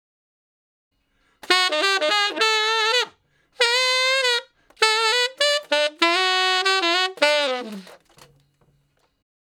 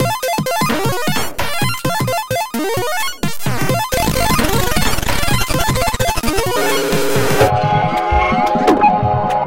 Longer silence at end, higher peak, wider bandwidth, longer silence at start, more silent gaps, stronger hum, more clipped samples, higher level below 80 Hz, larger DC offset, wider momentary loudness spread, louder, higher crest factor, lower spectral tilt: first, 1.65 s vs 0 s; about the same, 0 dBFS vs 0 dBFS; about the same, 18 kHz vs 17 kHz; first, 1.45 s vs 0 s; neither; neither; neither; second, -74 dBFS vs -28 dBFS; second, under 0.1% vs 7%; about the same, 5 LU vs 6 LU; second, -19 LUFS vs -16 LUFS; first, 22 dB vs 16 dB; second, 0 dB/octave vs -4 dB/octave